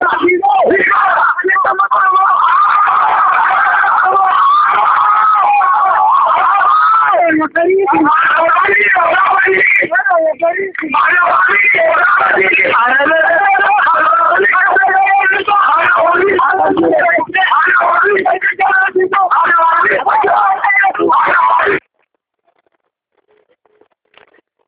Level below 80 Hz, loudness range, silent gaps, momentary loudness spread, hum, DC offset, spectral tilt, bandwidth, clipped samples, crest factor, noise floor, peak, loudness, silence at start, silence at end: -58 dBFS; 2 LU; none; 3 LU; none; under 0.1%; -7 dB/octave; 5 kHz; under 0.1%; 10 dB; -66 dBFS; 0 dBFS; -9 LUFS; 0 s; 2.9 s